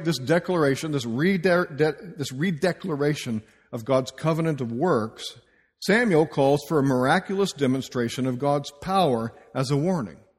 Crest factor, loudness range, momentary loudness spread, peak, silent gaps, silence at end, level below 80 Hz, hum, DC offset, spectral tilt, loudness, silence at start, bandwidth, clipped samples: 18 dB; 3 LU; 11 LU; -6 dBFS; none; 0.25 s; -60 dBFS; none; under 0.1%; -6 dB/octave; -24 LUFS; 0 s; 15.5 kHz; under 0.1%